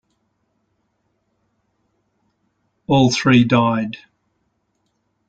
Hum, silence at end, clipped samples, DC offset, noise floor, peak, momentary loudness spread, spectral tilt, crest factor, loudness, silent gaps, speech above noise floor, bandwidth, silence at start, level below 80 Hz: none; 1.3 s; under 0.1%; under 0.1%; -69 dBFS; -2 dBFS; 20 LU; -6 dB/octave; 20 dB; -16 LUFS; none; 54 dB; 8.4 kHz; 2.9 s; -56 dBFS